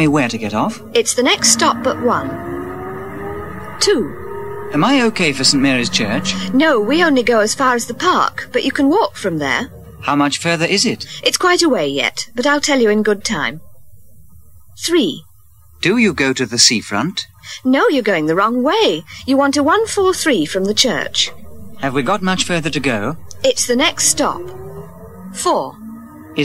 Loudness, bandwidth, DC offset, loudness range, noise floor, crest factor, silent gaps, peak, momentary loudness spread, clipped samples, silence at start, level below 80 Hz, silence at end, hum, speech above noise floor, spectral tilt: -15 LUFS; 16 kHz; under 0.1%; 4 LU; -48 dBFS; 16 dB; none; 0 dBFS; 14 LU; under 0.1%; 0 s; -46 dBFS; 0 s; none; 33 dB; -3 dB/octave